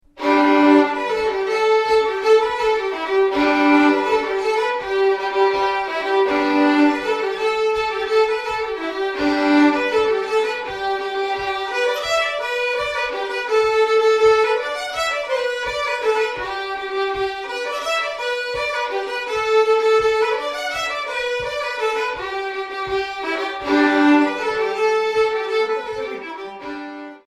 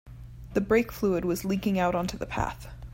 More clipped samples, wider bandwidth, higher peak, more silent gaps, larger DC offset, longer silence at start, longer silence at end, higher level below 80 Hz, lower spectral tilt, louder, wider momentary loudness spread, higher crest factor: neither; second, 13.5 kHz vs 16.5 kHz; first, -2 dBFS vs -12 dBFS; neither; neither; about the same, 0.15 s vs 0.05 s; about the same, 0.1 s vs 0 s; second, -52 dBFS vs -44 dBFS; second, -3.5 dB/octave vs -6 dB/octave; first, -19 LUFS vs -28 LUFS; second, 9 LU vs 13 LU; about the same, 18 dB vs 16 dB